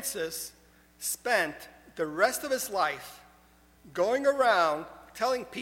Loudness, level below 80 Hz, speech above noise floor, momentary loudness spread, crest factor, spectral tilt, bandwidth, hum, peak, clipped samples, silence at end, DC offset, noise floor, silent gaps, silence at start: -29 LUFS; -64 dBFS; 31 dB; 17 LU; 20 dB; -2 dB/octave; 17 kHz; none; -10 dBFS; under 0.1%; 0 s; under 0.1%; -60 dBFS; none; 0 s